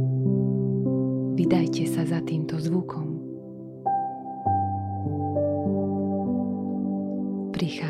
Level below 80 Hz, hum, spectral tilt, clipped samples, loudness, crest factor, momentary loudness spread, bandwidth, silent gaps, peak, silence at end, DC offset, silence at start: -62 dBFS; none; -8 dB/octave; under 0.1%; -27 LUFS; 16 dB; 8 LU; 13.5 kHz; none; -8 dBFS; 0 s; under 0.1%; 0 s